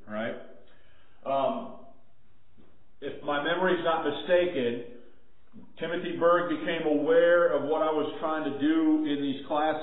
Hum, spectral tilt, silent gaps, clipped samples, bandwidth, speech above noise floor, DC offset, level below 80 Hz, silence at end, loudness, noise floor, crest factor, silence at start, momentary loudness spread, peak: none; -9.5 dB/octave; none; under 0.1%; 4.1 kHz; 39 dB; 0.7%; -66 dBFS; 0 s; -27 LUFS; -65 dBFS; 16 dB; 0.05 s; 15 LU; -12 dBFS